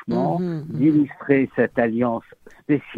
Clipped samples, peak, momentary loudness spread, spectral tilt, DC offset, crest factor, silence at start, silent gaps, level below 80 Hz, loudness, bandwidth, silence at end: under 0.1%; -2 dBFS; 8 LU; -10 dB/octave; under 0.1%; 18 dB; 0.05 s; none; -58 dBFS; -21 LUFS; 5 kHz; 0 s